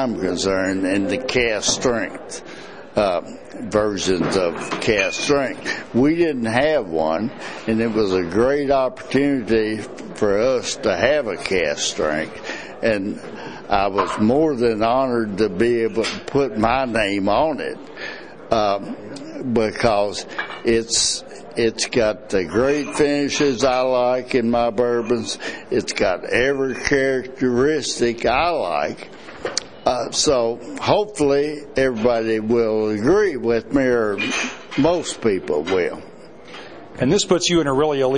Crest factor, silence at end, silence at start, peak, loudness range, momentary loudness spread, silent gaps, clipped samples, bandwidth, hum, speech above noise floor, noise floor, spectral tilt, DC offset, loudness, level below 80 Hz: 20 dB; 0 s; 0 s; 0 dBFS; 2 LU; 11 LU; none; under 0.1%; 10.5 kHz; none; 20 dB; -40 dBFS; -4 dB/octave; 0.6%; -20 LUFS; -44 dBFS